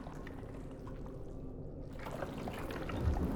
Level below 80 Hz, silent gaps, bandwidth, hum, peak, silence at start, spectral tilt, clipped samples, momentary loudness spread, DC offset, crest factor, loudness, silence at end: -46 dBFS; none; 18.5 kHz; none; -22 dBFS; 0 s; -7.5 dB/octave; under 0.1%; 10 LU; under 0.1%; 20 dB; -43 LUFS; 0 s